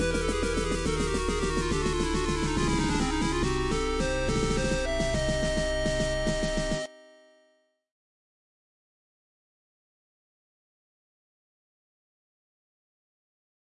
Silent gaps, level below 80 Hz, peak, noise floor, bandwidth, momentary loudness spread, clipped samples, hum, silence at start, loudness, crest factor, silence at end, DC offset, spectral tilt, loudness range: none; -36 dBFS; -14 dBFS; -69 dBFS; 11.5 kHz; 2 LU; under 0.1%; none; 0 s; -28 LUFS; 16 dB; 6.7 s; under 0.1%; -4.5 dB/octave; 7 LU